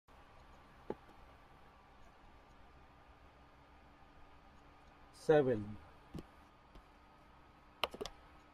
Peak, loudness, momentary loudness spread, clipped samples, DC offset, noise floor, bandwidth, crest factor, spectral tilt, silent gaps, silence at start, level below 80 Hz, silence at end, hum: -16 dBFS; -39 LUFS; 25 LU; under 0.1%; under 0.1%; -63 dBFS; 14 kHz; 28 dB; -6 dB/octave; none; 0.9 s; -64 dBFS; 0.45 s; none